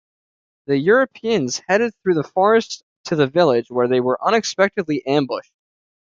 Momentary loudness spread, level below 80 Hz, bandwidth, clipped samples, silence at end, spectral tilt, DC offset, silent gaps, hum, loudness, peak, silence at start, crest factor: 7 LU; -64 dBFS; 7.6 kHz; under 0.1%; 0.7 s; -5 dB/octave; under 0.1%; 2.83-3.04 s; none; -18 LUFS; -2 dBFS; 0.7 s; 16 dB